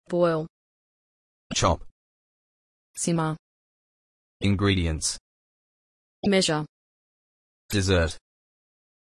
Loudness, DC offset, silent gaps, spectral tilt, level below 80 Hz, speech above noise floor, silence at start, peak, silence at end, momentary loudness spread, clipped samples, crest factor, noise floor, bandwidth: -25 LUFS; under 0.1%; 0.50-1.50 s, 1.91-2.94 s, 3.39-4.40 s, 5.20-6.23 s, 6.69-7.69 s; -4.5 dB/octave; -48 dBFS; over 66 dB; 0.1 s; -8 dBFS; 1 s; 16 LU; under 0.1%; 20 dB; under -90 dBFS; 12 kHz